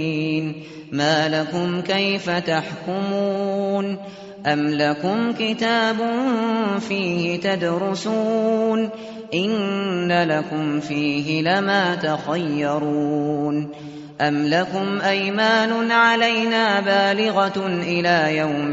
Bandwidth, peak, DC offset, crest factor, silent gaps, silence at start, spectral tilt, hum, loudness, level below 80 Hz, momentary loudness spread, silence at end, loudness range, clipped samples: 8 kHz; -4 dBFS; under 0.1%; 16 dB; none; 0 s; -3.5 dB/octave; none; -20 LUFS; -62 dBFS; 7 LU; 0 s; 4 LU; under 0.1%